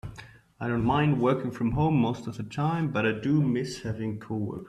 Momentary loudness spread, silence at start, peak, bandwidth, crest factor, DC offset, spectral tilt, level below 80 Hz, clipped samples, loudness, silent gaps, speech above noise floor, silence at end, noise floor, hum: 11 LU; 0.05 s; -10 dBFS; 10.5 kHz; 16 dB; under 0.1%; -7.5 dB/octave; -50 dBFS; under 0.1%; -27 LUFS; none; 22 dB; 0 s; -49 dBFS; none